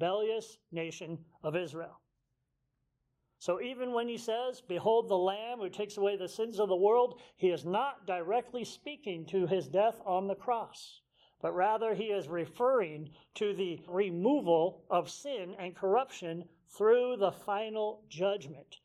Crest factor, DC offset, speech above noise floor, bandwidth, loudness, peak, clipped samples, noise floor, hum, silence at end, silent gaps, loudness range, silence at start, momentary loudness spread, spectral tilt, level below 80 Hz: 18 dB; under 0.1%; 49 dB; 14 kHz; -33 LUFS; -16 dBFS; under 0.1%; -82 dBFS; none; 0.1 s; none; 7 LU; 0 s; 13 LU; -5.5 dB/octave; -78 dBFS